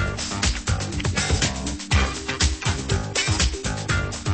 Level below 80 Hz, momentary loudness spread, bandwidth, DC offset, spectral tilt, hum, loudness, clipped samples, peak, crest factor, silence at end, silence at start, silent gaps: -30 dBFS; 4 LU; 8.8 kHz; 0.2%; -3.5 dB/octave; none; -23 LUFS; under 0.1%; -6 dBFS; 18 dB; 0 s; 0 s; none